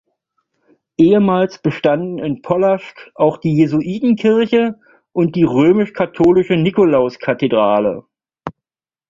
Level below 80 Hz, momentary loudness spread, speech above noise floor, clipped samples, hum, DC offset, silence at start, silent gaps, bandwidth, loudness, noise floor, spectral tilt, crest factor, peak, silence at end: -52 dBFS; 11 LU; 72 dB; under 0.1%; none; under 0.1%; 1 s; none; 7.4 kHz; -15 LUFS; -86 dBFS; -8.5 dB/octave; 14 dB; -2 dBFS; 0.6 s